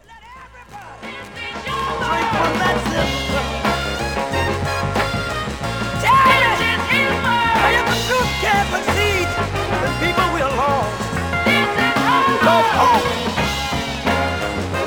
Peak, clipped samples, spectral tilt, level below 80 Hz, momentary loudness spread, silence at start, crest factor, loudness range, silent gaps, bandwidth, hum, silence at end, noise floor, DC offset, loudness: -2 dBFS; under 0.1%; -4.5 dB/octave; -36 dBFS; 9 LU; 0.1 s; 16 dB; 5 LU; none; over 20 kHz; none; 0 s; -40 dBFS; under 0.1%; -17 LUFS